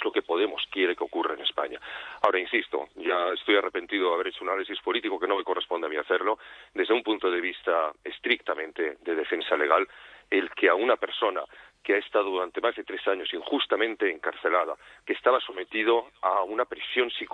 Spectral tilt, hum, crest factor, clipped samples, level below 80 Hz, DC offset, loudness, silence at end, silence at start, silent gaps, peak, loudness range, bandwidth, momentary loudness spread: -4 dB/octave; none; 22 dB; under 0.1%; -70 dBFS; under 0.1%; -27 LUFS; 0.05 s; 0 s; none; -6 dBFS; 2 LU; 6 kHz; 8 LU